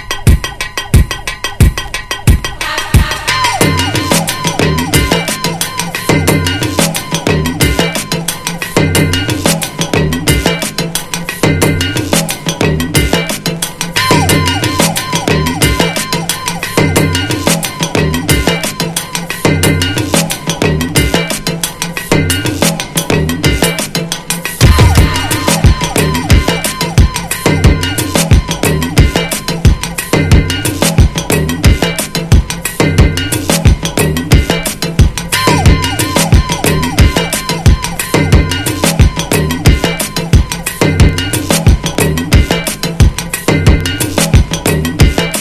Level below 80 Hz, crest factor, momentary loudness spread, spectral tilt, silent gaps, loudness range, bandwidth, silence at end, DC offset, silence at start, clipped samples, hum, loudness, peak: -18 dBFS; 10 dB; 6 LU; -4.5 dB/octave; none; 2 LU; 16 kHz; 0 s; under 0.1%; 0 s; 1%; none; -11 LUFS; 0 dBFS